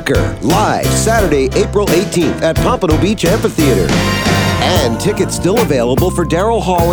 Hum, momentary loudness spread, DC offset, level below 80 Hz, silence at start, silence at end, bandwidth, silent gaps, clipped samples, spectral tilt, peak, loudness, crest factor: none; 2 LU; 0.5%; -24 dBFS; 0 s; 0 s; over 20 kHz; none; under 0.1%; -5 dB/octave; 0 dBFS; -13 LUFS; 12 dB